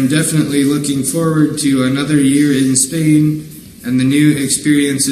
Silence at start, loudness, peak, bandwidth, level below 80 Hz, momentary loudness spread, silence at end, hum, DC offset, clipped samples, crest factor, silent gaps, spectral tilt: 0 s; -13 LUFS; 0 dBFS; 14.5 kHz; -50 dBFS; 5 LU; 0 s; none; under 0.1%; under 0.1%; 12 dB; none; -4.5 dB/octave